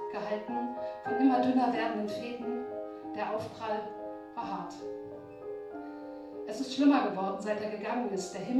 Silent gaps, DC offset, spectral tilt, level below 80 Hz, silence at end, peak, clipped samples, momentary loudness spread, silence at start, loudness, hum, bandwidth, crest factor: none; under 0.1%; -5.5 dB/octave; -72 dBFS; 0 s; -14 dBFS; under 0.1%; 16 LU; 0 s; -33 LUFS; none; 11.5 kHz; 20 dB